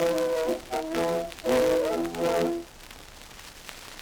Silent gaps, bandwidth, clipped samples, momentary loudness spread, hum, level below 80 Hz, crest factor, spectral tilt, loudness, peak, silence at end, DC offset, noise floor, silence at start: none; over 20 kHz; under 0.1%; 20 LU; none; -52 dBFS; 18 dB; -4.5 dB/octave; -27 LUFS; -10 dBFS; 0 s; under 0.1%; -46 dBFS; 0 s